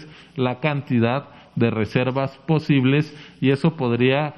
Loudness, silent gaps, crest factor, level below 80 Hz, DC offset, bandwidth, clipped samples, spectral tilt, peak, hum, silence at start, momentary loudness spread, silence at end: -21 LUFS; none; 18 dB; -58 dBFS; under 0.1%; 9 kHz; under 0.1%; -8.5 dB/octave; -4 dBFS; none; 0 s; 8 LU; 0 s